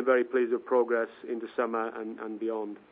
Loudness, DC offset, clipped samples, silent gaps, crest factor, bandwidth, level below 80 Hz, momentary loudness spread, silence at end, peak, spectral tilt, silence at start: -30 LUFS; under 0.1%; under 0.1%; none; 18 dB; 3.9 kHz; -82 dBFS; 11 LU; 0.15 s; -12 dBFS; -9 dB/octave; 0 s